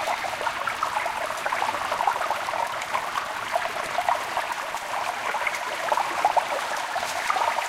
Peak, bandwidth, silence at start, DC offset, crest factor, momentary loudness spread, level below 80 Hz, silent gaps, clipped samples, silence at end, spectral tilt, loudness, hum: -8 dBFS; 16.5 kHz; 0 s; under 0.1%; 20 dB; 4 LU; -62 dBFS; none; under 0.1%; 0 s; -1 dB/octave; -26 LUFS; none